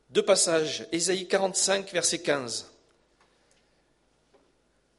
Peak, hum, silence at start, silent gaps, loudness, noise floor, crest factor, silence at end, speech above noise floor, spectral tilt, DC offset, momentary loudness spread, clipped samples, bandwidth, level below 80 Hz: -10 dBFS; 60 Hz at -65 dBFS; 0.1 s; none; -26 LUFS; -68 dBFS; 20 dB; 2.3 s; 42 dB; -2 dB/octave; under 0.1%; 8 LU; under 0.1%; 11.5 kHz; -72 dBFS